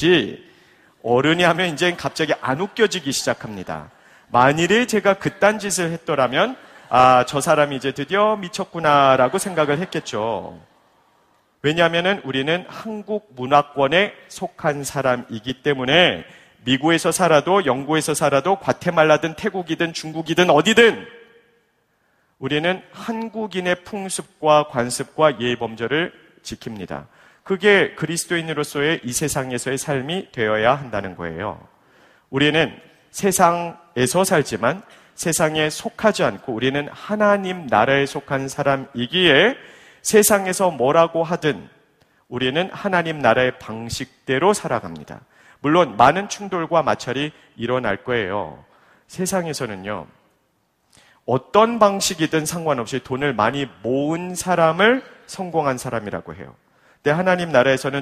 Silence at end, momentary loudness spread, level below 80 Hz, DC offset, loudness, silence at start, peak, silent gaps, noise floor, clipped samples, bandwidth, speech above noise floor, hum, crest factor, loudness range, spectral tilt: 0 s; 14 LU; -54 dBFS; under 0.1%; -19 LUFS; 0 s; 0 dBFS; none; -66 dBFS; under 0.1%; 15.5 kHz; 47 dB; none; 20 dB; 5 LU; -4 dB/octave